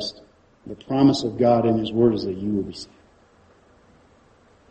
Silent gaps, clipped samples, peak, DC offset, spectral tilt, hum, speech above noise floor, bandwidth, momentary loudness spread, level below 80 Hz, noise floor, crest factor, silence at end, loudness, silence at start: none; under 0.1%; -4 dBFS; under 0.1%; -7 dB/octave; none; 35 dB; 8.4 kHz; 21 LU; -54 dBFS; -56 dBFS; 20 dB; 1.85 s; -21 LUFS; 0 s